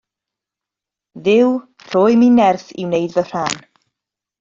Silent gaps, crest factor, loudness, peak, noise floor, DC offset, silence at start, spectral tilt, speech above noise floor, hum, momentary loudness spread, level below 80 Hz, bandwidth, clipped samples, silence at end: none; 14 dB; -16 LUFS; -2 dBFS; -86 dBFS; under 0.1%; 1.15 s; -5.5 dB/octave; 72 dB; none; 12 LU; -60 dBFS; 7.8 kHz; under 0.1%; 0.85 s